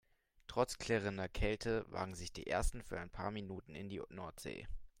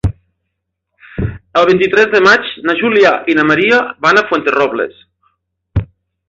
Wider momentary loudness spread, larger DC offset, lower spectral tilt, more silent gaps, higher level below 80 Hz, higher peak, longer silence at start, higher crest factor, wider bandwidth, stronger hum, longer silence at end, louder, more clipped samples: about the same, 11 LU vs 13 LU; neither; about the same, -5 dB/octave vs -5.5 dB/octave; neither; second, -50 dBFS vs -34 dBFS; second, -20 dBFS vs 0 dBFS; first, 0.5 s vs 0.05 s; first, 22 dB vs 14 dB; first, 16.5 kHz vs 7.8 kHz; neither; second, 0.1 s vs 0.45 s; second, -42 LUFS vs -12 LUFS; neither